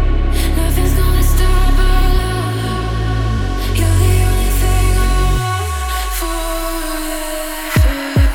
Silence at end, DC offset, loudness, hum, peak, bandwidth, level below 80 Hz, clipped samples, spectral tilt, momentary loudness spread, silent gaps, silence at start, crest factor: 0 s; under 0.1%; -16 LUFS; none; -2 dBFS; 18 kHz; -14 dBFS; under 0.1%; -5 dB/octave; 6 LU; none; 0 s; 12 dB